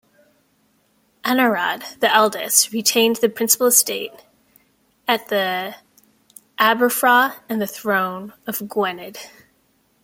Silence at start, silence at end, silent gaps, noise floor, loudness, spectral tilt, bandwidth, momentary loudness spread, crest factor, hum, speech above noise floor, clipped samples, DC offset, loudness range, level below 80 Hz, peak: 1.25 s; 0.75 s; none; -62 dBFS; -18 LUFS; -1.5 dB/octave; 17 kHz; 14 LU; 20 dB; none; 43 dB; under 0.1%; under 0.1%; 4 LU; -70 dBFS; 0 dBFS